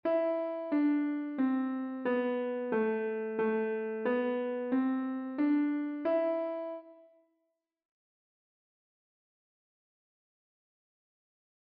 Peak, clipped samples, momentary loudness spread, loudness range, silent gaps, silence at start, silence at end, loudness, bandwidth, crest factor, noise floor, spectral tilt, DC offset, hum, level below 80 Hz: -20 dBFS; under 0.1%; 5 LU; 6 LU; none; 0.05 s; 4.7 s; -32 LUFS; 4.7 kHz; 14 dB; -82 dBFS; -5 dB/octave; under 0.1%; none; -84 dBFS